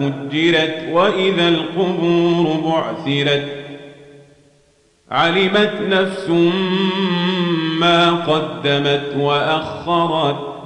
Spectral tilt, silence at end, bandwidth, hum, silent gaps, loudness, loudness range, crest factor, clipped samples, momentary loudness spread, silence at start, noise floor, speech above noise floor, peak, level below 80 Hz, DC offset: -6 dB/octave; 0 s; 10 kHz; none; none; -17 LUFS; 4 LU; 14 dB; under 0.1%; 6 LU; 0 s; -56 dBFS; 39 dB; -4 dBFS; -58 dBFS; under 0.1%